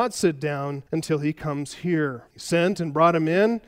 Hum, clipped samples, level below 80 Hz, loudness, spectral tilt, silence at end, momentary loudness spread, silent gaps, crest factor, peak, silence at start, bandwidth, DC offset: none; under 0.1%; -60 dBFS; -24 LUFS; -6 dB/octave; 0.1 s; 10 LU; none; 18 dB; -6 dBFS; 0 s; 16 kHz; under 0.1%